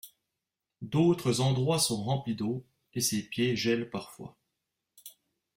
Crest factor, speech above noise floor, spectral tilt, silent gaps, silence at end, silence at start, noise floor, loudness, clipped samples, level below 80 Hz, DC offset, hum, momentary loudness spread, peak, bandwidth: 18 dB; 58 dB; -5 dB/octave; none; 0.45 s; 0.05 s; -88 dBFS; -29 LUFS; under 0.1%; -66 dBFS; under 0.1%; none; 22 LU; -14 dBFS; 16.5 kHz